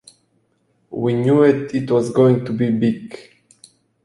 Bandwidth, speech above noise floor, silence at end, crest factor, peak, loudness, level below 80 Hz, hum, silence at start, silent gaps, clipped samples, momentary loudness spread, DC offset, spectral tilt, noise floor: 11.5 kHz; 47 dB; 0.85 s; 16 dB; -2 dBFS; -17 LUFS; -58 dBFS; none; 0.9 s; none; under 0.1%; 17 LU; under 0.1%; -8 dB/octave; -64 dBFS